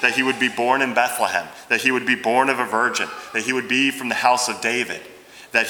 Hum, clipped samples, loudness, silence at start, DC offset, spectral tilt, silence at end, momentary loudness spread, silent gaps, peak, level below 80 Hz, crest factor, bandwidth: none; under 0.1%; -20 LUFS; 0 s; under 0.1%; -2 dB/octave; 0 s; 6 LU; none; 0 dBFS; -68 dBFS; 20 dB; over 20 kHz